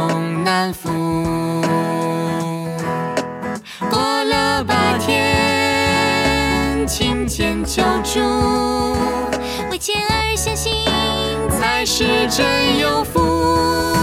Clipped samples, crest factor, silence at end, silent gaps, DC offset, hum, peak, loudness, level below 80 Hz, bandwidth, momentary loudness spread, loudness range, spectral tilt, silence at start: under 0.1%; 16 dB; 0 s; none; under 0.1%; none; -2 dBFS; -17 LUFS; -32 dBFS; 16.5 kHz; 7 LU; 4 LU; -4 dB/octave; 0 s